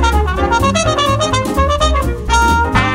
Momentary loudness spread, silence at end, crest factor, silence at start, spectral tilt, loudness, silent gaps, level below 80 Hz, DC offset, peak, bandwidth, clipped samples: 3 LU; 0 s; 12 dB; 0 s; -4.5 dB/octave; -14 LUFS; none; -20 dBFS; under 0.1%; 0 dBFS; 16.5 kHz; under 0.1%